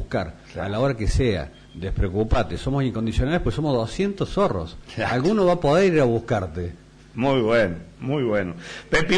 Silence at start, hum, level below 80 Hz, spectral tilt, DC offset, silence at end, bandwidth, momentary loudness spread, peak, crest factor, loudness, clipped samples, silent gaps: 0 s; none; -34 dBFS; -6.5 dB/octave; under 0.1%; 0 s; 10.5 kHz; 14 LU; -8 dBFS; 14 dB; -23 LUFS; under 0.1%; none